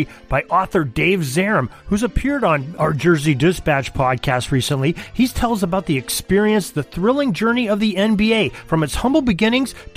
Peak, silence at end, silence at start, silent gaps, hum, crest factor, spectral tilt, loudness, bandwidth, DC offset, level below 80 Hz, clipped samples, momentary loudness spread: -2 dBFS; 0.05 s; 0 s; none; none; 14 dB; -5.5 dB/octave; -18 LUFS; 15.5 kHz; under 0.1%; -34 dBFS; under 0.1%; 5 LU